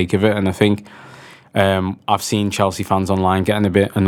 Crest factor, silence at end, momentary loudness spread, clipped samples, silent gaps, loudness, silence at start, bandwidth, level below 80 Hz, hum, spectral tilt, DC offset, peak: 18 dB; 0 s; 4 LU; under 0.1%; none; -18 LUFS; 0 s; 17 kHz; -50 dBFS; none; -6 dB/octave; under 0.1%; 0 dBFS